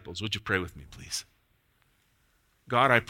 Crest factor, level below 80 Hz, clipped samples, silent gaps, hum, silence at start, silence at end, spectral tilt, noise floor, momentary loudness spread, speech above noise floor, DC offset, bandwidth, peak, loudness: 26 dB; -58 dBFS; under 0.1%; none; none; 0.05 s; 0.05 s; -4 dB/octave; -69 dBFS; 15 LU; 41 dB; under 0.1%; 16.5 kHz; -6 dBFS; -30 LUFS